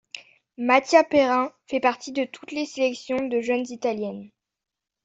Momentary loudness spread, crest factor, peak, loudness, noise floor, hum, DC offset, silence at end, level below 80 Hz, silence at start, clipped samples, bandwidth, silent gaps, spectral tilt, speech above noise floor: 13 LU; 20 dB; -4 dBFS; -23 LUFS; -87 dBFS; none; under 0.1%; 0.75 s; -68 dBFS; 0.15 s; under 0.1%; 8 kHz; none; -4 dB/octave; 63 dB